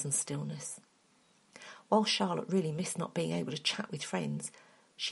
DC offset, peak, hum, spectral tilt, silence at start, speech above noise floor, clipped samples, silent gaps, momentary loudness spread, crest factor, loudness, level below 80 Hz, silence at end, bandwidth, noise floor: under 0.1%; -14 dBFS; none; -4 dB/octave; 0 s; 34 dB; under 0.1%; none; 14 LU; 22 dB; -34 LUFS; -78 dBFS; 0 s; 11.5 kHz; -68 dBFS